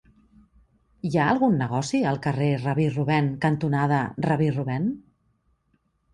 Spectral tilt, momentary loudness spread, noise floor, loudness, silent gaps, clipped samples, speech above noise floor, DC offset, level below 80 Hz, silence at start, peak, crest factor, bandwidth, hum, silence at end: -7 dB/octave; 5 LU; -69 dBFS; -24 LUFS; none; under 0.1%; 46 dB; under 0.1%; -56 dBFS; 1.05 s; -8 dBFS; 16 dB; 10.5 kHz; none; 1.15 s